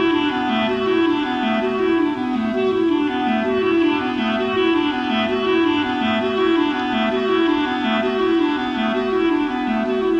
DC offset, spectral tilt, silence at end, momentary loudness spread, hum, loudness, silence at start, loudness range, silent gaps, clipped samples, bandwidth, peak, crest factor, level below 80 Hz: under 0.1%; -6 dB/octave; 0 s; 3 LU; none; -19 LUFS; 0 s; 1 LU; none; under 0.1%; 7.4 kHz; -8 dBFS; 12 dB; -50 dBFS